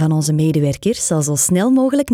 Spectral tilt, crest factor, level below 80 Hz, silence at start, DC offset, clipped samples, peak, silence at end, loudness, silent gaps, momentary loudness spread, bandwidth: -5.5 dB/octave; 12 dB; -48 dBFS; 0 s; under 0.1%; under 0.1%; -4 dBFS; 0 s; -16 LUFS; none; 4 LU; 16 kHz